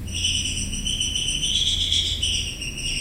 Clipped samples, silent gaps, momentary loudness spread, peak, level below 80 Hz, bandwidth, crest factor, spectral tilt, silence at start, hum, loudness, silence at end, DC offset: under 0.1%; none; 6 LU; -6 dBFS; -34 dBFS; 16.5 kHz; 18 dB; -1 dB/octave; 0 s; none; -22 LUFS; 0 s; under 0.1%